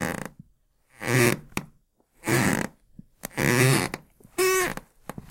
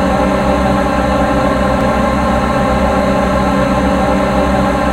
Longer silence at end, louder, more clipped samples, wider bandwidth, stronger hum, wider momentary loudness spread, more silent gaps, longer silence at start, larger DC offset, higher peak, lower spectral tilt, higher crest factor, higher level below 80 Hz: first, 0.2 s vs 0 s; second, -25 LUFS vs -13 LUFS; neither; about the same, 17 kHz vs 16 kHz; neither; first, 19 LU vs 1 LU; neither; about the same, 0 s vs 0 s; neither; second, -6 dBFS vs 0 dBFS; second, -4.5 dB/octave vs -6.5 dB/octave; first, 22 dB vs 12 dB; second, -52 dBFS vs -22 dBFS